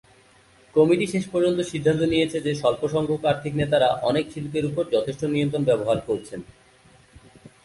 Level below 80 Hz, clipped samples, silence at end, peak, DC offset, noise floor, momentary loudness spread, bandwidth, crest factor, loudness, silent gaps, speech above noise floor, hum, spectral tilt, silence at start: -54 dBFS; under 0.1%; 0.15 s; -6 dBFS; under 0.1%; -55 dBFS; 6 LU; 11.5 kHz; 18 dB; -23 LUFS; none; 33 dB; none; -6 dB/octave; 0.75 s